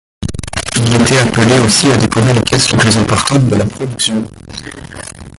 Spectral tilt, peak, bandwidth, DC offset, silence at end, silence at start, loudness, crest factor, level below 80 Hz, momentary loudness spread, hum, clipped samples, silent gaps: -4.5 dB/octave; 0 dBFS; 11.5 kHz; under 0.1%; 0.1 s; 0.2 s; -11 LUFS; 12 dB; -32 dBFS; 18 LU; none; under 0.1%; none